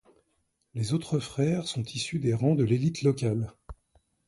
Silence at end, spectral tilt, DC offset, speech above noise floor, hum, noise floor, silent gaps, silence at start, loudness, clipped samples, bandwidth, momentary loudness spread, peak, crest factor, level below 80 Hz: 0.55 s; -6.5 dB/octave; under 0.1%; 48 dB; none; -75 dBFS; none; 0.75 s; -28 LUFS; under 0.1%; 11.5 kHz; 8 LU; -12 dBFS; 18 dB; -56 dBFS